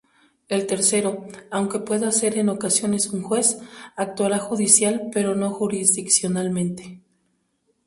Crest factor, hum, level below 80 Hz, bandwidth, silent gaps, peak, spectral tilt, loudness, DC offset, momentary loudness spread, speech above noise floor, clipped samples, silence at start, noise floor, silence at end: 22 dB; none; -64 dBFS; 12 kHz; none; 0 dBFS; -3.5 dB/octave; -21 LUFS; under 0.1%; 13 LU; 47 dB; under 0.1%; 0.5 s; -69 dBFS; 0.9 s